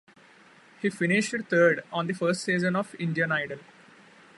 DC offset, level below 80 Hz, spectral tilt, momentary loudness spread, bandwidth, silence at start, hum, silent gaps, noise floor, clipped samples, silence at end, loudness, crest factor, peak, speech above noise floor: under 0.1%; -74 dBFS; -5.5 dB/octave; 10 LU; 11.5 kHz; 0.8 s; none; none; -55 dBFS; under 0.1%; 0.75 s; -26 LUFS; 20 dB; -8 dBFS; 29 dB